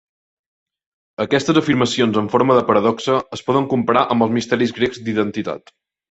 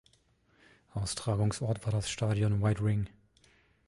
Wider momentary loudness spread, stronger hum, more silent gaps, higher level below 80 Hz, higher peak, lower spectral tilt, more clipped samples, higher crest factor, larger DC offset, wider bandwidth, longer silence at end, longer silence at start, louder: about the same, 9 LU vs 8 LU; neither; neither; about the same, -56 dBFS vs -52 dBFS; first, -2 dBFS vs -16 dBFS; about the same, -5.5 dB/octave vs -6 dB/octave; neither; about the same, 16 dB vs 18 dB; neither; second, 8.2 kHz vs 11.5 kHz; second, 0.55 s vs 0.8 s; first, 1.2 s vs 0.95 s; first, -18 LUFS vs -32 LUFS